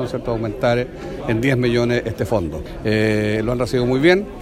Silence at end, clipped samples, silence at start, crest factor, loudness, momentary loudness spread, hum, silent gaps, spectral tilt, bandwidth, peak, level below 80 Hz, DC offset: 0 s; under 0.1%; 0 s; 16 dB; -19 LUFS; 8 LU; none; none; -6.5 dB/octave; 15 kHz; -2 dBFS; -38 dBFS; under 0.1%